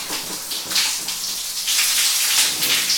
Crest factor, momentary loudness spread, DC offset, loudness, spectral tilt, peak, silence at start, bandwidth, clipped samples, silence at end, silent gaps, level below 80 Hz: 18 dB; 10 LU; under 0.1%; -18 LUFS; 2 dB/octave; -4 dBFS; 0 s; over 20 kHz; under 0.1%; 0 s; none; -58 dBFS